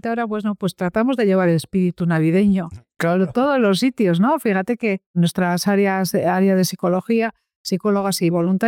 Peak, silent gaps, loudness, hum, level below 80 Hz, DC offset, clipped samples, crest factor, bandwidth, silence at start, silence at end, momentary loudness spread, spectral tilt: -10 dBFS; 5.06-5.14 s, 7.56-7.65 s; -19 LUFS; none; -56 dBFS; under 0.1%; under 0.1%; 10 dB; 17.5 kHz; 0.05 s; 0 s; 6 LU; -6 dB/octave